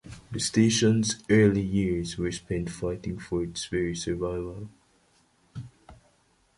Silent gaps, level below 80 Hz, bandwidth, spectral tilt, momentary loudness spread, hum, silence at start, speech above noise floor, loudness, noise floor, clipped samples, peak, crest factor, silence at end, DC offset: none; -48 dBFS; 11.5 kHz; -5 dB/octave; 22 LU; none; 0.05 s; 40 dB; -27 LUFS; -66 dBFS; under 0.1%; -8 dBFS; 20 dB; 0.65 s; under 0.1%